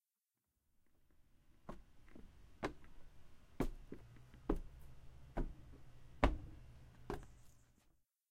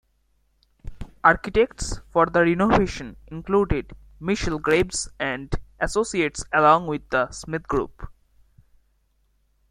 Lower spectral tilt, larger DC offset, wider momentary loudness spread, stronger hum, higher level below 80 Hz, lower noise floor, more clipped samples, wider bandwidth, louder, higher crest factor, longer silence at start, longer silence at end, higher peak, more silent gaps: first, -6.5 dB/octave vs -5 dB/octave; neither; first, 26 LU vs 16 LU; neither; second, -50 dBFS vs -38 dBFS; first, under -90 dBFS vs -66 dBFS; neither; first, 15.5 kHz vs 14 kHz; second, -46 LUFS vs -22 LUFS; first, 34 dB vs 22 dB; first, 1 s vs 0.85 s; second, 0.4 s vs 1.6 s; second, -14 dBFS vs -2 dBFS; neither